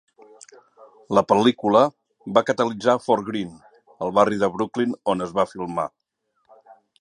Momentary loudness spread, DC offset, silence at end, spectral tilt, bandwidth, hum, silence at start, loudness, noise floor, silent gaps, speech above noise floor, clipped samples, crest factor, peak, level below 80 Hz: 11 LU; under 0.1%; 0.25 s; -6 dB/octave; 10.5 kHz; none; 1.1 s; -22 LUFS; -72 dBFS; none; 51 dB; under 0.1%; 22 dB; -2 dBFS; -62 dBFS